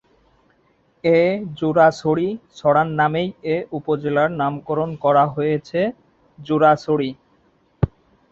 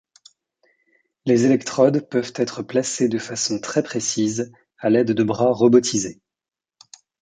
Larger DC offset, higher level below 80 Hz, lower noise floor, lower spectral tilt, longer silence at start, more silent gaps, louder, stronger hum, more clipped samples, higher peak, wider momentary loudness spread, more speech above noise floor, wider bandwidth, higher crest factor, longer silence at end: neither; first, -46 dBFS vs -64 dBFS; second, -60 dBFS vs -90 dBFS; first, -7.5 dB/octave vs -4.5 dB/octave; second, 1.05 s vs 1.25 s; neither; about the same, -20 LUFS vs -20 LUFS; neither; neither; about the same, -2 dBFS vs -2 dBFS; about the same, 9 LU vs 9 LU; second, 42 dB vs 71 dB; second, 7.8 kHz vs 9.6 kHz; about the same, 18 dB vs 18 dB; second, 0.45 s vs 1.1 s